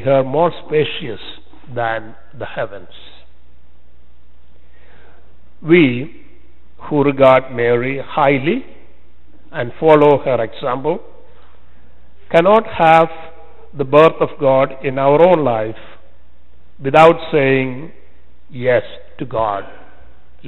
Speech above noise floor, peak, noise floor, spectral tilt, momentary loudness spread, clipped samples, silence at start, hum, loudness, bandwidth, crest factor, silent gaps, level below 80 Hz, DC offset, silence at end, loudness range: 35 dB; 0 dBFS; -50 dBFS; -8 dB/octave; 18 LU; under 0.1%; 0 s; none; -15 LUFS; 8.8 kHz; 16 dB; none; -48 dBFS; 4%; 0 s; 13 LU